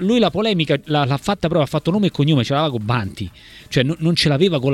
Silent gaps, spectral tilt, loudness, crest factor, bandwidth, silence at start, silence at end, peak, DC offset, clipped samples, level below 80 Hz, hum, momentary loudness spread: none; -6.5 dB/octave; -18 LUFS; 16 dB; 14 kHz; 0 s; 0 s; -2 dBFS; under 0.1%; under 0.1%; -46 dBFS; none; 6 LU